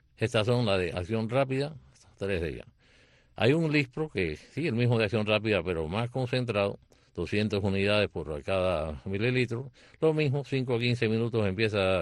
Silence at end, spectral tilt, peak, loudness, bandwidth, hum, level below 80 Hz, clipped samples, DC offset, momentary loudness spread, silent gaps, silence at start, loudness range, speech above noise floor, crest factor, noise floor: 0 s; -7 dB/octave; -12 dBFS; -29 LUFS; 11.5 kHz; none; -52 dBFS; under 0.1%; under 0.1%; 7 LU; none; 0.2 s; 2 LU; 33 dB; 18 dB; -61 dBFS